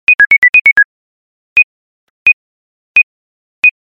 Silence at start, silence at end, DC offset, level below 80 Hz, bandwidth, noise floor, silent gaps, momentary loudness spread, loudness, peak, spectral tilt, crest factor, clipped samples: 0.1 s; 0.15 s; under 0.1%; -58 dBFS; 8.4 kHz; under -90 dBFS; 0.38-0.42 s, 0.49-0.53 s, 0.61-0.65 s, 0.85-1.56 s, 1.64-2.26 s, 2.33-2.95 s, 3.03-3.62 s; 10 LU; -8 LUFS; 0 dBFS; -1 dB/octave; 12 dB; under 0.1%